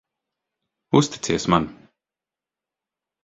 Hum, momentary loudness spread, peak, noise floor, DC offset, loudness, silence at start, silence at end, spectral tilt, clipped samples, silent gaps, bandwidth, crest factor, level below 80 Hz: none; 4 LU; -2 dBFS; -89 dBFS; under 0.1%; -21 LUFS; 0.9 s; 1.5 s; -5 dB/octave; under 0.1%; none; 8.2 kHz; 24 dB; -52 dBFS